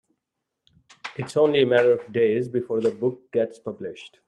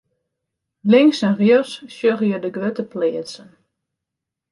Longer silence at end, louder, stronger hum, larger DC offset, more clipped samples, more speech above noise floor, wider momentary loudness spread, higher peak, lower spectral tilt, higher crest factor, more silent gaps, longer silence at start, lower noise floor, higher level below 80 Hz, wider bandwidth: second, 0.2 s vs 1.15 s; second, -22 LUFS vs -18 LUFS; neither; neither; neither; second, 59 dB vs 66 dB; about the same, 17 LU vs 16 LU; second, -6 dBFS vs -2 dBFS; about the same, -6.5 dB/octave vs -6.5 dB/octave; about the same, 18 dB vs 18 dB; neither; first, 1.05 s vs 0.85 s; about the same, -82 dBFS vs -83 dBFS; about the same, -70 dBFS vs -68 dBFS; about the same, 10.5 kHz vs 11.5 kHz